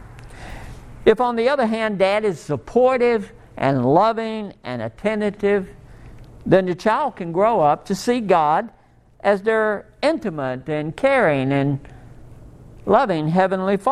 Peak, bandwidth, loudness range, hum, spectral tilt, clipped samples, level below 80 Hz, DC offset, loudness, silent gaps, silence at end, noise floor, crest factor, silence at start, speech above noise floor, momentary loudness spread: 0 dBFS; 13.5 kHz; 3 LU; none; -6.5 dB/octave; under 0.1%; -48 dBFS; under 0.1%; -20 LUFS; none; 0 s; -42 dBFS; 20 dB; 0 s; 23 dB; 13 LU